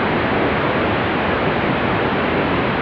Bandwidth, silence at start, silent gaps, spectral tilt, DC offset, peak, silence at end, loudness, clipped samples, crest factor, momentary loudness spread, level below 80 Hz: 5.4 kHz; 0 s; none; -8.5 dB/octave; under 0.1%; -6 dBFS; 0 s; -18 LUFS; under 0.1%; 12 dB; 1 LU; -38 dBFS